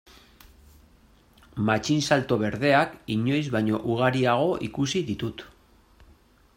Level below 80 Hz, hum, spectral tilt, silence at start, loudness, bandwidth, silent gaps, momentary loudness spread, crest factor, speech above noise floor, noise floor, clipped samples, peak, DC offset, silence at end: -56 dBFS; none; -5.5 dB/octave; 1.55 s; -25 LUFS; 16 kHz; none; 9 LU; 20 dB; 33 dB; -57 dBFS; under 0.1%; -6 dBFS; under 0.1%; 1.1 s